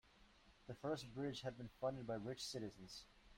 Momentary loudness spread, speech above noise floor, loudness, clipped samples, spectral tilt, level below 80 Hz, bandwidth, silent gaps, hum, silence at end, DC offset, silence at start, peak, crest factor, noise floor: 11 LU; 22 dB; -49 LUFS; under 0.1%; -5 dB/octave; -72 dBFS; 16 kHz; none; none; 0 s; under 0.1%; 0.05 s; -32 dBFS; 18 dB; -70 dBFS